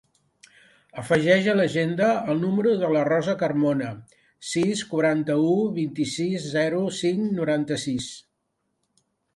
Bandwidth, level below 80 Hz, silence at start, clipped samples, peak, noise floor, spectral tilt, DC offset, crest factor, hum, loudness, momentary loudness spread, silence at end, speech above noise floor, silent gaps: 11.5 kHz; -64 dBFS; 0.95 s; under 0.1%; -6 dBFS; -76 dBFS; -5.5 dB/octave; under 0.1%; 18 dB; none; -23 LUFS; 9 LU; 1.15 s; 53 dB; none